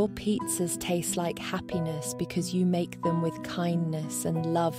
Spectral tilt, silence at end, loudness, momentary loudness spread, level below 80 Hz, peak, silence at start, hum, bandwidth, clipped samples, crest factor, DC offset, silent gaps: -5.5 dB/octave; 0 s; -30 LUFS; 5 LU; -58 dBFS; -14 dBFS; 0 s; none; 16 kHz; under 0.1%; 14 dB; under 0.1%; none